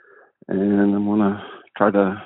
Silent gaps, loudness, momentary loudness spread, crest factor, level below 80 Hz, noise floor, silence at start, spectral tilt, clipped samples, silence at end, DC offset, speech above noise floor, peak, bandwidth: none; -20 LUFS; 11 LU; 20 dB; -60 dBFS; -45 dBFS; 0.5 s; -7.5 dB/octave; under 0.1%; 0 s; under 0.1%; 26 dB; 0 dBFS; 4 kHz